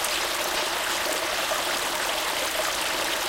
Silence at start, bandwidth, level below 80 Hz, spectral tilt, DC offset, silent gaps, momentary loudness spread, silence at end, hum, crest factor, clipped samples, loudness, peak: 0 s; 17 kHz; -54 dBFS; 0 dB/octave; under 0.1%; none; 0 LU; 0 s; none; 16 dB; under 0.1%; -25 LUFS; -10 dBFS